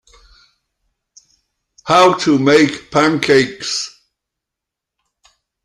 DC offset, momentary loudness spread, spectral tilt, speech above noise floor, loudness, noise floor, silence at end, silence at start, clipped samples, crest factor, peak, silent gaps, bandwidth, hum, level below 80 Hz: under 0.1%; 11 LU; -4.5 dB/octave; 70 dB; -13 LUFS; -83 dBFS; 1.75 s; 1.85 s; under 0.1%; 18 dB; 0 dBFS; none; 12.5 kHz; none; -56 dBFS